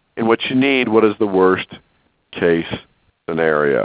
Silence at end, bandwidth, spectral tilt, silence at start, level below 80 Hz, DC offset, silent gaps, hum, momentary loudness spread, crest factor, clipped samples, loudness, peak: 0 s; 4 kHz; -9.5 dB/octave; 0.15 s; -52 dBFS; under 0.1%; none; none; 16 LU; 18 dB; under 0.1%; -16 LUFS; 0 dBFS